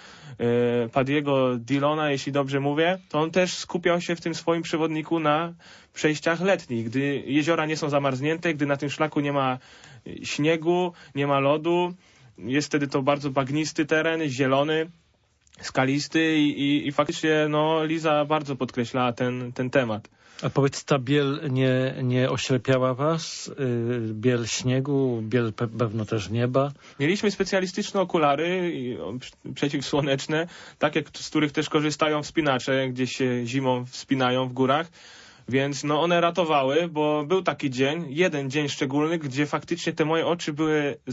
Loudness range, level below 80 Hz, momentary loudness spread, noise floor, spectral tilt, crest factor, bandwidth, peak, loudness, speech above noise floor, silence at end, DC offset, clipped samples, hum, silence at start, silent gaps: 2 LU; -62 dBFS; 6 LU; -64 dBFS; -5.5 dB/octave; 18 dB; 8 kHz; -6 dBFS; -25 LUFS; 39 dB; 0 s; under 0.1%; under 0.1%; none; 0 s; none